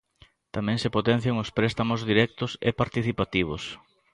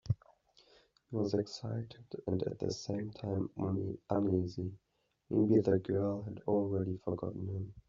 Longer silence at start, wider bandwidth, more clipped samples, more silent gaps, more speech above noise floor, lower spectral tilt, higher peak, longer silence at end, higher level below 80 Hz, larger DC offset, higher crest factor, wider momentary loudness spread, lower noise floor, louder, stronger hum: first, 0.55 s vs 0.05 s; first, 11 kHz vs 7.4 kHz; neither; neither; about the same, 34 dB vs 32 dB; second, -6.5 dB/octave vs -8.5 dB/octave; first, -8 dBFS vs -16 dBFS; first, 0.4 s vs 0.1 s; first, -50 dBFS vs -66 dBFS; neither; about the same, 20 dB vs 18 dB; about the same, 10 LU vs 11 LU; second, -59 dBFS vs -67 dBFS; first, -26 LUFS vs -36 LUFS; neither